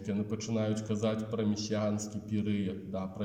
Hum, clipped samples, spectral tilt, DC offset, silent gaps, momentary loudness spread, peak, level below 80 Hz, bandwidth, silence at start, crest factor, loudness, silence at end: none; under 0.1%; -6 dB/octave; under 0.1%; none; 4 LU; -20 dBFS; -66 dBFS; 9.4 kHz; 0 s; 14 dB; -34 LUFS; 0 s